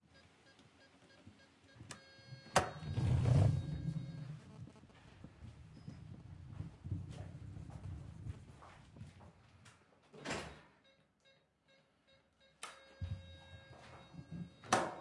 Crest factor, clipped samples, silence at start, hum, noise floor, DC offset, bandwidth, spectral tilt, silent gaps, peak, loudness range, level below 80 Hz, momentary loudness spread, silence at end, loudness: 28 dB; under 0.1%; 0.15 s; none; -73 dBFS; under 0.1%; 11.5 kHz; -5.5 dB/octave; none; -16 dBFS; 15 LU; -60 dBFS; 25 LU; 0 s; -41 LUFS